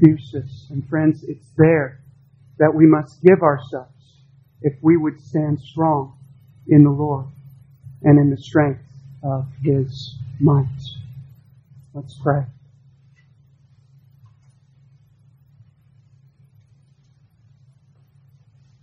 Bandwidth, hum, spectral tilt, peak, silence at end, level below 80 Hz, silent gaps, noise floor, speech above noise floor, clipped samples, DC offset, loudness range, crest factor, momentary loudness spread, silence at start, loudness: 6.6 kHz; none; -10 dB/octave; 0 dBFS; 6.3 s; -56 dBFS; none; -56 dBFS; 39 dB; under 0.1%; under 0.1%; 13 LU; 20 dB; 20 LU; 0 s; -18 LUFS